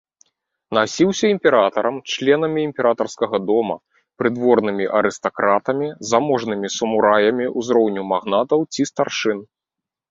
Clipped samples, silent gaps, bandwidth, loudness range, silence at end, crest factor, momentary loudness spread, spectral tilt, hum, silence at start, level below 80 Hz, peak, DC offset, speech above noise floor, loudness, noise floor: under 0.1%; none; 7.8 kHz; 1 LU; 0.65 s; 18 dB; 7 LU; -4.5 dB/octave; none; 0.7 s; -62 dBFS; -2 dBFS; under 0.1%; 67 dB; -19 LUFS; -86 dBFS